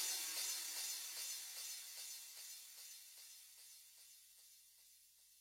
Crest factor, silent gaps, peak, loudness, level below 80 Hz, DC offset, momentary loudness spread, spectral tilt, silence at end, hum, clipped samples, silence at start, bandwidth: 22 dB; none; -30 dBFS; -46 LUFS; under -90 dBFS; under 0.1%; 22 LU; 4.5 dB/octave; 0 s; 60 Hz at -95 dBFS; under 0.1%; 0 s; 16.5 kHz